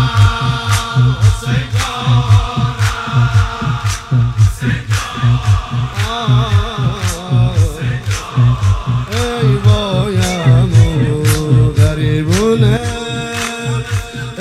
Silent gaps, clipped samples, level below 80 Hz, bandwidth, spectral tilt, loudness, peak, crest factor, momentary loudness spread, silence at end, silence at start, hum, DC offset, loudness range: none; under 0.1%; -26 dBFS; 13.5 kHz; -6 dB/octave; -14 LUFS; 0 dBFS; 12 dB; 7 LU; 0 s; 0 s; none; under 0.1%; 3 LU